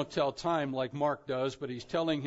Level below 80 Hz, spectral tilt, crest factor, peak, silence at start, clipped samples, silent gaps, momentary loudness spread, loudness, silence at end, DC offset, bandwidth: -66 dBFS; -4.5 dB/octave; 16 dB; -16 dBFS; 0 s; under 0.1%; none; 4 LU; -33 LUFS; 0 s; under 0.1%; 7.6 kHz